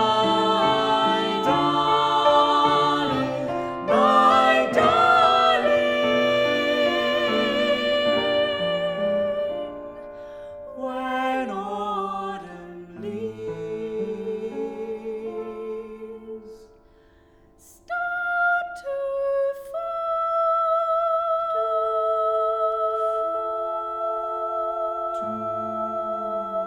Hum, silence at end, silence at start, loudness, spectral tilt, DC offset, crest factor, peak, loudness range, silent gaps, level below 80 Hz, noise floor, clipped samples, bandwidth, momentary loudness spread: none; 0 s; 0 s; -22 LUFS; -4.5 dB/octave; under 0.1%; 16 dB; -6 dBFS; 13 LU; none; -58 dBFS; -55 dBFS; under 0.1%; 15.5 kHz; 15 LU